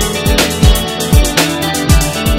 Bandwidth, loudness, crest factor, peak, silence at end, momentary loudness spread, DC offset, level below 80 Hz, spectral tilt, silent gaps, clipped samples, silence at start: 16.5 kHz; -12 LUFS; 10 dB; 0 dBFS; 0 s; 3 LU; under 0.1%; -16 dBFS; -4 dB/octave; none; 0.2%; 0 s